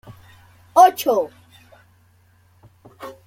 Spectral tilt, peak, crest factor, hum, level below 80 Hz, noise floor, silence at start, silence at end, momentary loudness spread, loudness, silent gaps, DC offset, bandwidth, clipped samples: -3.5 dB/octave; -2 dBFS; 20 dB; none; -64 dBFS; -56 dBFS; 0.75 s; 0.15 s; 25 LU; -17 LUFS; none; under 0.1%; 16.5 kHz; under 0.1%